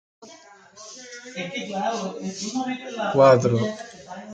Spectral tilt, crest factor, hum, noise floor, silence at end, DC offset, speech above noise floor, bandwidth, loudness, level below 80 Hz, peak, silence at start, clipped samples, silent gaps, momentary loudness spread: -5.5 dB/octave; 20 dB; none; -48 dBFS; 0 s; under 0.1%; 26 dB; 9 kHz; -23 LUFS; -66 dBFS; -4 dBFS; 0.2 s; under 0.1%; none; 23 LU